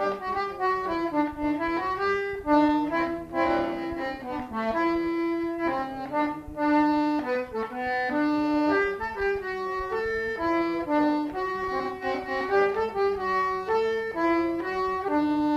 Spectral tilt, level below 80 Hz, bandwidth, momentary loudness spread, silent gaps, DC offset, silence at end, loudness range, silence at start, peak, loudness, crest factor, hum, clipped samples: -6 dB/octave; -52 dBFS; 13 kHz; 6 LU; none; under 0.1%; 0 s; 2 LU; 0 s; -10 dBFS; -27 LUFS; 16 dB; none; under 0.1%